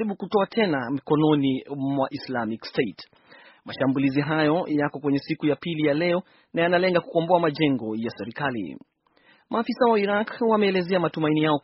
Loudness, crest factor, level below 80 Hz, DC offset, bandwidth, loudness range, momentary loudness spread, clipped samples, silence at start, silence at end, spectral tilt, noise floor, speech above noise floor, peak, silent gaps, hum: -24 LUFS; 18 dB; -66 dBFS; under 0.1%; 5.8 kHz; 2 LU; 8 LU; under 0.1%; 0 s; 0.05 s; -5 dB/octave; -60 dBFS; 36 dB; -6 dBFS; none; none